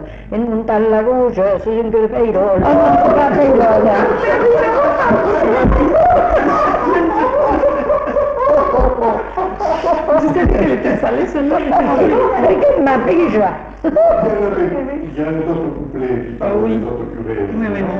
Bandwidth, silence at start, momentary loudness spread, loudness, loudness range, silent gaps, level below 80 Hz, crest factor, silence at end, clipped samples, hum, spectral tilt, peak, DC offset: 7.4 kHz; 0 s; 9 LU; -14 LUFS; 5 LU; none; -28 dBFS; 12 dB; 0 s; under 0.1%; none; -8.5 dB/octave; -2 dBFS; under 0.1%